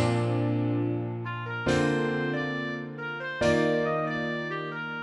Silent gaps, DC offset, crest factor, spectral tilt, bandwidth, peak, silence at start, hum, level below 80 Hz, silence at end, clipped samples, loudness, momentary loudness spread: none; under 0.1%; 16 dB; -6.5 dB/octave; 11 kHz; -12 dBFS; 0 s; none; -56 dBFS; 0 s; under 0.1%; -28 LUFS; 9 LU